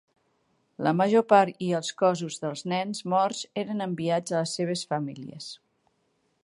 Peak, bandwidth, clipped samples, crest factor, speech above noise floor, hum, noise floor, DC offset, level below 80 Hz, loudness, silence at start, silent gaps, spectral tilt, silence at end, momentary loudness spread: -6 dBFS; 11.5 kHz; under 0.1%; 22 dB; 46 dB; none; -72 dBFS; under 0.1%; -74 dBFS; -26 LUFS; 0.8 s; none; -5 dB/octave; 0.9 s; 15 LU